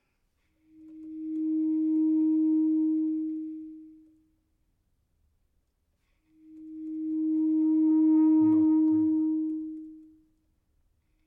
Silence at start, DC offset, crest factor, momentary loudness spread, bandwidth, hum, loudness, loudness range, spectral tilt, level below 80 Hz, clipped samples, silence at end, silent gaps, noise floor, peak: 0.85 s; under 0.1%; 12 dB; 19 LU; 1.3 kHz; none; -26 LUFS; 13 LU; -12 dB/octave; -72 dBFS; under 0.1%; 1.25 s; none; -74 dBFS; -16 dBFS